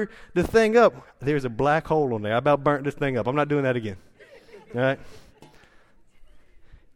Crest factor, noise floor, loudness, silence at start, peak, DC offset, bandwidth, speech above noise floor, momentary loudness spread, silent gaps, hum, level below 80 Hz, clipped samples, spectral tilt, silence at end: 18 dB; -54 dBFS; -23 LUFS; 0 s; -6 dBFS; under 0.1%; 15 kHz; 31 dB; 12 LU; none; none; -50 dBFS; under 0.1%; -7 dB/octave; 0.2 s